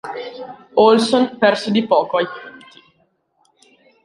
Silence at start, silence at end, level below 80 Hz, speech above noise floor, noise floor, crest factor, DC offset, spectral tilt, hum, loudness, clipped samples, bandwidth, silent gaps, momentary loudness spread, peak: 0.05 s; 1.5 s; -64 dBFS; 48 dB; -63 dBFS; 18 dB; under 0.1%; -5 dB/octave; none; -16 LUFS; under 0.1%; 11.5 kHz; none; 21 LU; -2 dBFS